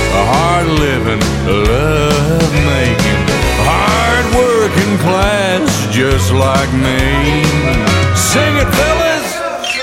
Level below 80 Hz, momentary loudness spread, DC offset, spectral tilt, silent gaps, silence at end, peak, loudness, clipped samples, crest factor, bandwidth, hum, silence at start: -22 dBFS; 2 LU; under 0.1%; -5 dB/octave; none; 0 s; 0 dBFS; -12 LUFS; under 0.1%; 12 dB; 16.5 kHz; none; 0 s